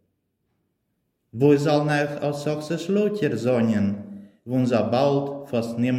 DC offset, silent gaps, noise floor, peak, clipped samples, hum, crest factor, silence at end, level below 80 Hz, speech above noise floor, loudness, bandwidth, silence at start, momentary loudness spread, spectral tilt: under 0.1%; none; -74 dBFS; -6 dBFS; under 0.1%; none; 18 dB; 0 s; -68 dBFS; 53 dB; -23 LUFS; 14.5 kHz; 1.35 s; 8 LU; -7 dB/octave